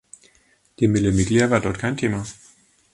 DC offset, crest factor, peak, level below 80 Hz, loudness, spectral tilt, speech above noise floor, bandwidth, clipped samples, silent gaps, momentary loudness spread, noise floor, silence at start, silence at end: under 0.1%; 20 dB; -2 dBFS; -42 dBFS; -21 LUFS; -6 dB/octave; 40 dB; 11.5 kHz; under 0.1%; none; 8 LU; -60 dBFS; 0.8 s; 0.6 s